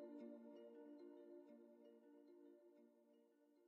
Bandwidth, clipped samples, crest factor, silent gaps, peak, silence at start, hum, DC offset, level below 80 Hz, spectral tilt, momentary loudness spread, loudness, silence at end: 4.2 kHz; under 0.1%; 16 dB; none; -48 dBFS; 0 s; none; under 0.1%; under -90 dBFS; -5.5 dB/octave; 9 LU; -63 LUFS; 0 s